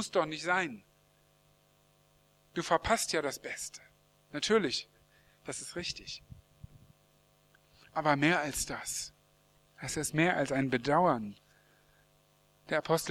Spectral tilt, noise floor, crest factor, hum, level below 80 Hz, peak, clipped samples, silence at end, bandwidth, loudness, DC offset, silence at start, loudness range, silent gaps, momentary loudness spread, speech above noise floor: -3.5 dB/octave; -67 dBFS; 24 dB; 50 Hz at -65 dBFS; -60 dBFS; -12 dBFS; under 0.1%; 0 s; 18.5 kHz; -32 LUFS; under 0.1%; 0 s; 5 LU; none; 17 LU; 36 dB